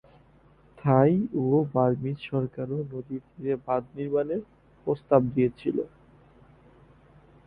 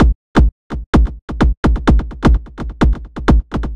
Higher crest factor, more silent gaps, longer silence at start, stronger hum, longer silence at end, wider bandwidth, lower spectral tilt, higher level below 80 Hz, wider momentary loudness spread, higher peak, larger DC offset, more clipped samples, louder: first, 22 dB vs 14 dB; second, none vs 0.15-0.35 s, 0.52-0.70 s, 0.86-0.93 s, 1.22-1.28 s, 1.57-1.63 s; first, 0.85 s vs 0 s; neither; first, 1.6 s vs 0 s; second, 4.7 kHz vs 7.8 kHz; first, -11.5 dB/octave vs -8 dB/octave; second, -58 dBFS vs -16 dBFS; first, 12 LU vs 5 LU; second, -6 dBFS vs 0 dBFS; neither; neither; second, -27 LUFS vs -16 LUFS